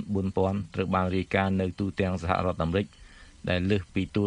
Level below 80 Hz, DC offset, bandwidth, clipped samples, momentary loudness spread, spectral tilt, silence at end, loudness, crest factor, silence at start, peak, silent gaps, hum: -48 dBFS; under 0.1%; 10 kHz; under 0.1%; 4 LU; -7.5 dB/octave; 0 s; -28 LUFS; 20 dB; 0 s; -8 dBFS; none; none